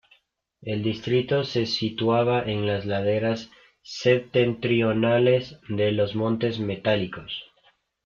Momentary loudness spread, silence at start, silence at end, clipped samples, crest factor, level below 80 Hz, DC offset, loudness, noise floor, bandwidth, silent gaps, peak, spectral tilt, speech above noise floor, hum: 11 LU; 0.6 s; 0.6 s; under 0.1%; 18 dB; -58 dBFS; under 0.1%; -24 LUFS; -64 dBFS; 7.2 kHz; none; -6 dBFS; -6.5 dB/octave; 40 dB; none